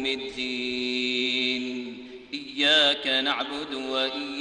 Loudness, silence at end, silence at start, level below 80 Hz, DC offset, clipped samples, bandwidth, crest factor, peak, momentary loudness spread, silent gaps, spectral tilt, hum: -24 LUFS; 0 s; 0 s; -64 dBFS; under 0.1%; under 0.1%; 10.5 kHz; 18 dB; -10 dBFS; 16 LU; none; -2 dB/octave; none